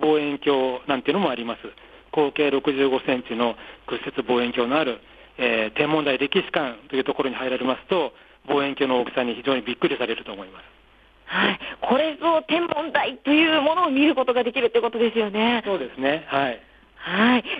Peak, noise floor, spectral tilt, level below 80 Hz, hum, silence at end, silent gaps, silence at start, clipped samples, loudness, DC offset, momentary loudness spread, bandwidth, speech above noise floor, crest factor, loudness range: -6 dBFS; -54 dBFS; -7 dB/octave; -60 dBFS; none; 0 s; none; 0 s; under 0.1%; -23 LUFS; under 0.1%; 9 LU; 5 kHz; 32 dB; 16 dB; 4 LU